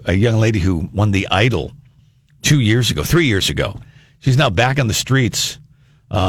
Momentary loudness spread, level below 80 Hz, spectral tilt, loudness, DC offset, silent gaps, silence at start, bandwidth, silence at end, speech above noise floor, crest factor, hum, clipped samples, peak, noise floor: 10 LU; -36 dBFS; -5 dB/octave; -16 LUFS; under 0.1%; none; 0 s; 18 kHz; 0 s; 36 dB; 16 dB; none; under 0.1%; 0 dBFS; -51 dBFS